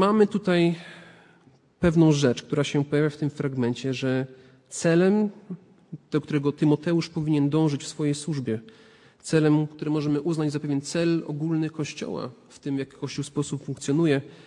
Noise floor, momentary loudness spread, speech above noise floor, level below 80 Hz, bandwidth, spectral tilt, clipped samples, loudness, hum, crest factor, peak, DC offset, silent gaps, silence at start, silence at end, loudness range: -58 dBFS; 13 LU; 33 dB; -58 dBFS; 11 kHz; -6.5 dB/octave; under 0.1%; -25 LUFS; none; 18 dB; -6 dBFS; under 0.1%; none; 0 s; 0.1 s; 4 LU